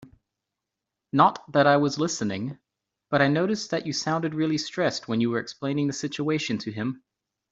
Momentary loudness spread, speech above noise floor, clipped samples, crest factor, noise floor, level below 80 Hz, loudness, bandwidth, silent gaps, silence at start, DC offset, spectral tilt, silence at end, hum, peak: 9 LU; 61 dB; under 0.1%; 22 dB; -86 dBFS; -68 dBFS; -25 LUFS; 8 kHz; none; 0 s; under 0.1%; -5 dB/octave; 0.55 s; none; -4 dBFS